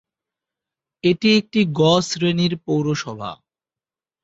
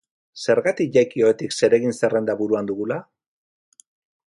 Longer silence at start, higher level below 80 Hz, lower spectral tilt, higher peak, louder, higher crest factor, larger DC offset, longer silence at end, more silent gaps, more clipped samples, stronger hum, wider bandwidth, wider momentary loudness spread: first, 1.05 s vs 0.35 s; first, -58 dBFS vs -66 dBFS; about the same, -5.5 dB/octave vs -5 dB/octave; about the same, -4 dBFS vs -4 dBFS; about the same, -19 LUFS vs -21 LUFS; about the same, 16 dB vs 18 dB; neither; second, 0.9 s vs 1.3 s; neither; neither; neither; second, 8 kHz vs 11.5 kHz; first, 12 LU vs 9 LU